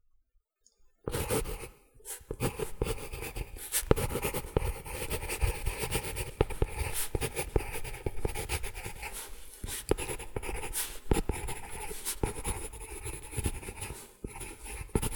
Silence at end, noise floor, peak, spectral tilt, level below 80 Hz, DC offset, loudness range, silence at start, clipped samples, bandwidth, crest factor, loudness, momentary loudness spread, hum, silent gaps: 0 s; -71 dBFS; -4 dBFS; -4 dB/octave; -40 dBFS; under 0.1%; 4 LU; 0.85 s; under 0.1%; over 20 kHz; 30 dB; -35 LUFS; 10 LU; none; none